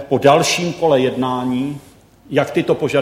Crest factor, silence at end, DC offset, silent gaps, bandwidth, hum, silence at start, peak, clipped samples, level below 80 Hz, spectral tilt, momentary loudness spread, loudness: 16 dB; 0 s; under 0.1%; none; 16 kHz; none; 0 s; 0 dBFS; under 0.1%; -54 dBFS; -5 dB/octave; 9 LU; -17 LUFS